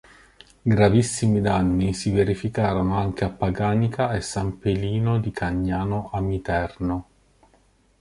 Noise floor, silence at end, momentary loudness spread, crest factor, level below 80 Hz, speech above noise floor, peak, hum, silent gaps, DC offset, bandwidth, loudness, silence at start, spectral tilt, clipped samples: -60 dBFS; 1 s; 7 LU; 20 dB; -40 dBFS; 38 dB; -4 dBFS; none; none; under 0.1%; 11.5 kHz; -23 LUFS; 0.65 s; -6.5 dB/octave; under 0.1%